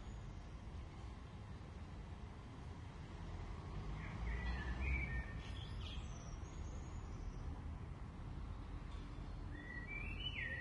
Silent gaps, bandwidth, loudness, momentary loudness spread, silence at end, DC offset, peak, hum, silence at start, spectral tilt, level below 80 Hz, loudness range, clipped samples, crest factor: none; 10.5 kHz; -49 LUFS; 10 LU; 0 s; under 0.1%; -30 dBFS; none; 0 s; -5.5 dB/octave; -50 dBFS; 6 LU; under 0.1%; 16 dB